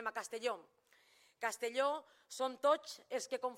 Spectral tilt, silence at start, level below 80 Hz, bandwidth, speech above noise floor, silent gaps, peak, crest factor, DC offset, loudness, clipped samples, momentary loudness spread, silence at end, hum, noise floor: -1 dB/octave; 0 s; under -90 dBFS; 16.5 kHz; 30 dB; none; -20 dBFS; 20 dB; under 0.1%; -39 LUFS; under 0.1%; 10 LU; 0 s; none; -69 dBFS